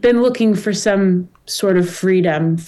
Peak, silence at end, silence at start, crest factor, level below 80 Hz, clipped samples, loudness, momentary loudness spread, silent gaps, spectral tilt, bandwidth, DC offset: -6 dBFS; 0 s; 0.05 s; 10 dB; -52 dBFS; under 0.1%; -16 LUFS; 5 LU; none; -6 dB/octave; 12.5 kHz; under 0.1%